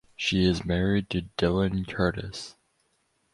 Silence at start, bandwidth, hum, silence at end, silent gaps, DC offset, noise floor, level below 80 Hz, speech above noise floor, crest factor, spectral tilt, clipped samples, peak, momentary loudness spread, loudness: 0.2 s; 11.5 kHz; none; 0.85 s; none; under 0.1%; -71 dBFS; -44 dBFS; 45 dB; 18 dB; -6 dB/octave; under 0.1%; -10 dBFS; 13 LU; -27 LUFS